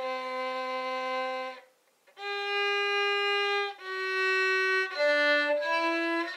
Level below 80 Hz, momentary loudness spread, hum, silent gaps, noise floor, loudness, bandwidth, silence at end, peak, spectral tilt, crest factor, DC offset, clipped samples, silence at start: under -90 dBFS; 9 LU; none; none; -64 dBFS; -28 LUFS; 15 kHz; 0 s; -16 dBFS; 0 dB/octave; 14 dB; under 0.1%; under 0.1%; 0 s